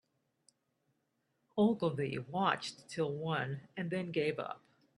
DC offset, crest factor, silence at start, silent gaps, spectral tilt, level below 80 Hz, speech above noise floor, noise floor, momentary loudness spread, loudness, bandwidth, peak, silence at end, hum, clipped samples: under 0.1%; 22 dB; 1.55 s; none; -6 dB/octave; -76 dBFS; 46 dB; -81 dBFS; 11 LU; -36 LUFS; 11.5 kHz; -16 dBFS; 0.4 s; none; under 0.1%